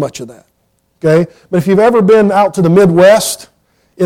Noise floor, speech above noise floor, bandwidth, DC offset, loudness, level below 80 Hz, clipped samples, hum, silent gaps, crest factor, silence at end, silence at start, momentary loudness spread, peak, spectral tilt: -57 dBFS; 48 dB; 16 kHz; under 0.1%; -9 LUFS; -48 dBFS; under 0.1%; none; none; 10 dB; 0 s; 0 s; 12 LU; 0 dBFS; -6 dB/octave